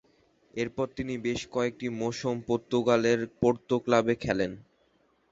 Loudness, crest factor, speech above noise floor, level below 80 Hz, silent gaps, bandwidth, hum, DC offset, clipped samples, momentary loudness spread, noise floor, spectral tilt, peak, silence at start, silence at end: -29 LUFS; 20 dB; 40 dB; -58 dBFS; none; 8 kHz; none; under 0.1%; under 0.1%; 9 LU; -68 dBFS; -5.5 dB/octave; -8 dBFS; 0.55 s; 0.7 s